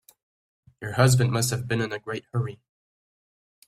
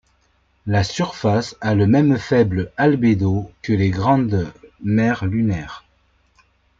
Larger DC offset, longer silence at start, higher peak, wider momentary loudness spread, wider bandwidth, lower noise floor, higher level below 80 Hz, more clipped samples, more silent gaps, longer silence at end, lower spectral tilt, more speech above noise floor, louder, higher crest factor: neither; first, 0.8 s vs 0.65 s; about the same, -4 dBFS vs -4 dBFS; about the same, 13 LU vs 11 LU; first, 14.5 kHz vs 7.8 kHz; first, under -90 dBFS vs -61 dBFS; second, -56 dBFS vs -46 dBFS; neither; neither; about the same, 1.1 s vs 1 s; second, -5 dB/octave vs -7.5 dB/octave; first, over 66 dB vs 44 dB; second, -25 LUFS vs -19 LUFS; first, 22 dB vs 16 dB